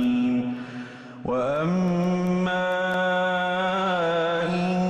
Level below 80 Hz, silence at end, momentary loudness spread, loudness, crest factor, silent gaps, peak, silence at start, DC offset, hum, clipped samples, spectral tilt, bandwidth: -58 dBFS; 0 s; 10 LU; -24 LUFS; 10 dB; none; -14 dBFS; 0 s; under 0.1%; none; under 0.1%; -7 dB/octave; 9 kHz